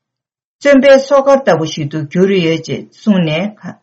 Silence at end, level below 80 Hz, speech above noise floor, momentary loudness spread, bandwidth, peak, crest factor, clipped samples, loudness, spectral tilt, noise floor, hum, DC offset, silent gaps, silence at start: 0.1 s; -52 dBFS; 71 dB; 11 LU; 8 kHz; 0 dBFS; 12 dB; under 0.1%; -12 LUFS; -6 dB/octave; -82 dBFS; none; under 0.1%; none; 0.6 s